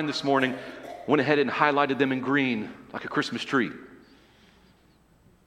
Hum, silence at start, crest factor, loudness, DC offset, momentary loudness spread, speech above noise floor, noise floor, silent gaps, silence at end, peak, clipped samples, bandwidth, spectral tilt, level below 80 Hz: none; 0 s; 22 dB; -25 LUFS; under 0.1%; 15 LU; 34 dB; -60 dBFS; none; 1.5 s; -4 dBFS; under 0.1%; 11 kHz; -5.5 dB/octave; -66 dBFS